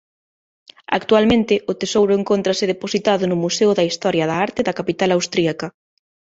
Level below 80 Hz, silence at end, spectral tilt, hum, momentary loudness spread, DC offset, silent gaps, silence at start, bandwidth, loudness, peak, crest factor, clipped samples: -52 dBFS; 0.65 s; -4.5 dB/octave; none; 6 LU; under 0.1%; none; 0.9 s; 8 kHz; -18 LUFS; -2 dBFS; 16 dB; under 0.1%